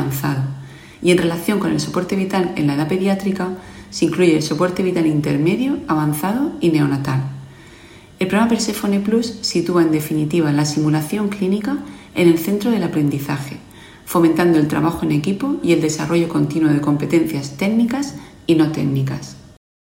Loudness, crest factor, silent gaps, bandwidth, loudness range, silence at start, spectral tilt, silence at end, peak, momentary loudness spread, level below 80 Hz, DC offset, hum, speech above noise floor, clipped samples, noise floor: -18 LUFS; 16 dB; none; 16.5 kHz; 2 LU; 0 s; -6 dB/octave; 0.55 s; -2 dBFS; 9 LU; -50 dBFS; under 0.1%; none; 25 dB; under 0.1%; -42 dBFS